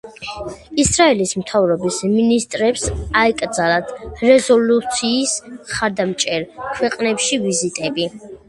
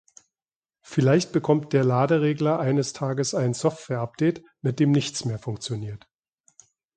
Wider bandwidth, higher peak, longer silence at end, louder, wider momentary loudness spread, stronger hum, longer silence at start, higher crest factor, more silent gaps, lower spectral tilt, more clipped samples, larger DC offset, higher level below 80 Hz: first, 11.5 kHz vs 9.4 kHz; first, 0 dBFS vs -6 dBFS; second, 0.15 s vs 1 s; first, -17 LUFS vs -24 LUFS; about the same, 11 LU vs 10 LU; neither; second, 0.05 s vs 0.9 s; about the same, 18 dB vs 18 dB; neither; second, -3.5 dB/octave vs -6 dB/octave; neither; neither; first, -40 dBFS vs -62 dBFS